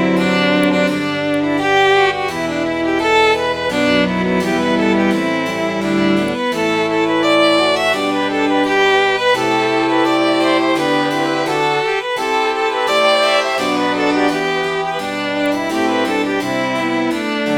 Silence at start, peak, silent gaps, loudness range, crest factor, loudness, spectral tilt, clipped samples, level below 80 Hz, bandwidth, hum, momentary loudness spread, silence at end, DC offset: 0 s; -2 dBFS; none; 2 LU; 14 dB; -15 LUFS; -4.5 dB/octave; under 0.1%; -50 dBFS; over 20 kHz; none; 6 LU; 0 s; 0.1%